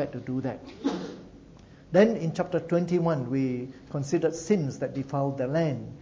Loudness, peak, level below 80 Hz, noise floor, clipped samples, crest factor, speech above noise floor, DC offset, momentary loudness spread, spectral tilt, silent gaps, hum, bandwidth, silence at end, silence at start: -28 LUFS; -8 dBFS; -58 dBFS; -50 dBFS; under 0.1%; 20 dB; 23 dB; under 0.1%; 12 LU; -7 dB/octave; none; none; 7.8 kHz; 0 s; 0 s